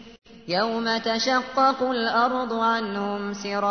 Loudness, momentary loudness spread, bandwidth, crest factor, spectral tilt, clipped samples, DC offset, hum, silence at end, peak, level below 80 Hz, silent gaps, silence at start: -24 LUFS; 7 LU; 6.6 kHz; 16 dB; -4 dB/octave; under 0.1%; 0.1%; none; 0 s; -8 dBFS; -62 dBFS; none; 0 s